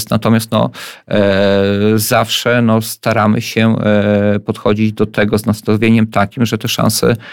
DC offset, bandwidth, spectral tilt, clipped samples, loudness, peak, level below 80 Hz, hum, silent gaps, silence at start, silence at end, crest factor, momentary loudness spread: under 0.1%; 18 kHz; -5.5 dB/octave; under 0.1%; -13 LUFS; 0 dBFS; -44 dBFS; none; none; 0 s; 0 s; 12 dB; 4 LU